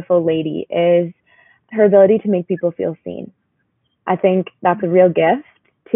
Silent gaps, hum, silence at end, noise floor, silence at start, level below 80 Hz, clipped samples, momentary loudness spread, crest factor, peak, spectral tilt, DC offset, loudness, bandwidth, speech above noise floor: none; none; 0 s; -67 dBFS; 0 s; -64 dBFS; under 0.1%; 15 LU; 16 dB; 0 dBFS; -4 dB/octave; under 0.1%; -16 LUFS; 3.6 kHz; 52 dB